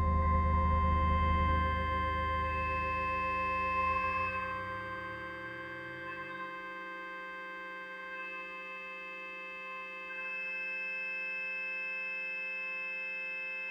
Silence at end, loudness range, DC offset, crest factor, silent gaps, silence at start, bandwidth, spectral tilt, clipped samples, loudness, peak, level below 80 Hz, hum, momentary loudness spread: 0 s; 10 LU; under 0.1%; 16 dB; none; 0 s; 6.6 kHz; -7 dB/octave; under 0.1%; -35 LUFS; -18 dBFS; -42 dBFS; none; 12 LU